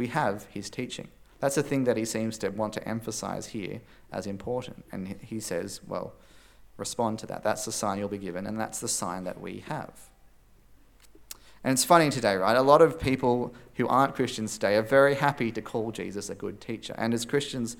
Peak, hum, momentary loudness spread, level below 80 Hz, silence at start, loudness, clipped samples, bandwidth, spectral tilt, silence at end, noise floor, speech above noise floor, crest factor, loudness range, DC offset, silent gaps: -4 dBFS; none; 17 LU; -58 dBFS; 0 s; -28 LUFS; under 0.1%; 18 kHz; -4.5 dB/octave; 0.05 s; -56 dBFS; 29 dB; 24 dB; 12 LU; under 0.1%; none